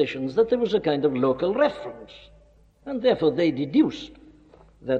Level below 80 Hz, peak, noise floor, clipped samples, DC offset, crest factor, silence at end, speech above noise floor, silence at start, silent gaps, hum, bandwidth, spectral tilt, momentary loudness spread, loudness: -56 dBFS; -8 dBFS; -55 dBFS; under 0.1%; under 0.1%; 16 dB; 0 s; 32 dB; 0 s; none; none; 7.6 kHz; -7.5 dB/octave; 17 LU; -23 LUFS